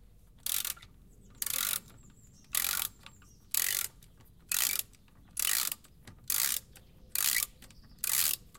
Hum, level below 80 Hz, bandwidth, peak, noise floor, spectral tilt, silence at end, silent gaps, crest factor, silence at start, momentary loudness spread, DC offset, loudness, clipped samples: none; -60 dBFS; 17.5 kHz; -10 dBFS; -59 dBFS; 1.5 dB/octave; 0 s; none; 26 dB; 0.45 s; 10 LU; under 0.1%; -31 LUFS; under 0.1%